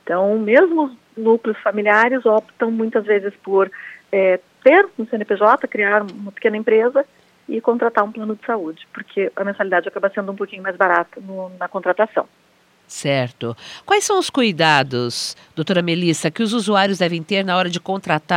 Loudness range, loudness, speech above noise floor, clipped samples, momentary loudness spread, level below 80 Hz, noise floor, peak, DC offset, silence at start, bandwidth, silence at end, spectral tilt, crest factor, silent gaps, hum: 5 LU; -18 LUFS; 38 dB; under 0.1%; 12 LU; -70 dBFS; -56 dBFS; 0 dBFS; under 0.1%; 0.05 s; 15.5 kHz; 0 s; -4.5 dB/octave; 18 dB; none; none